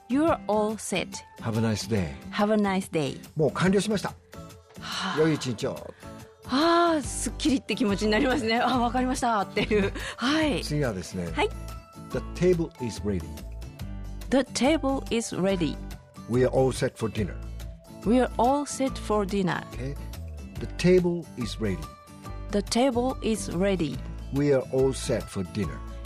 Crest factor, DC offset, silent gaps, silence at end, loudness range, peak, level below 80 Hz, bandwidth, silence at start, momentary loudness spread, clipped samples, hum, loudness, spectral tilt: 16 dB; under 0.1%; none; 0 s; 3 LU; -12 dBFS; -42 dBFS; 15.5 kHz; 0.1 s; 16 LU; under 0.1%; none; -27 LUFS; -5.5 dB/octave